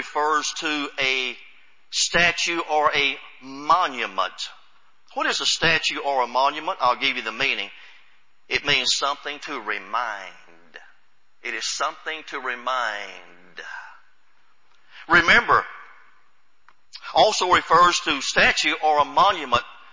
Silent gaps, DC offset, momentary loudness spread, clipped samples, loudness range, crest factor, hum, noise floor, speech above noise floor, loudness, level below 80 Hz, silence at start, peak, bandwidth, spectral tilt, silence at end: none; 0.4%; 17 LU; under 0.1%; 10 LU; 18 dB; none; -65 dBFS; 43 dB; -21 LUFS; -54 dBFS; 0 s; -4 dBFS; 7.8 kHz; -1.5 dB/octave; 0.2 s